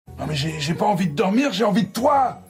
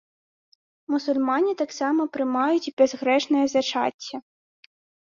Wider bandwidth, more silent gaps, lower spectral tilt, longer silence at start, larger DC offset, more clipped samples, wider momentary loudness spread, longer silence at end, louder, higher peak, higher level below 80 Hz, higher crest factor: first, 16 kHz vs 7.4 kHz; second, none vs 2.73-2.77 s, 3.94-3.99 s; first, -5.5 dB/octave vs -3 dB/octave; second, 0.1 s vs 0.9 s; neither; neither; about the same, 6 LU vs 7 LU; second, 0.05 s vs 0.85 s; about the same, -21 LUFS vs -23 LUFS; about the same, -6 dBFS vs -6 dBFS; first, -52 dBFS vs -72 dBFS; about the same, 14 dB vs 18 dB